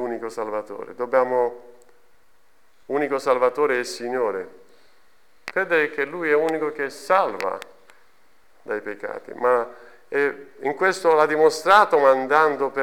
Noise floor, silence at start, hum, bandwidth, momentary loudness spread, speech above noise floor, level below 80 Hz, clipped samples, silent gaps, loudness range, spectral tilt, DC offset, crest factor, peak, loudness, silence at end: -62 dBFS; 0 s; none; 18.5 kHz; 14 LU; 41 dB; -70 dBFS; under 0.1%; none; 7 LU; -4 dB/octave; 0.3%; 20 dB; -4 dBFS; -21 LUFS; 0 s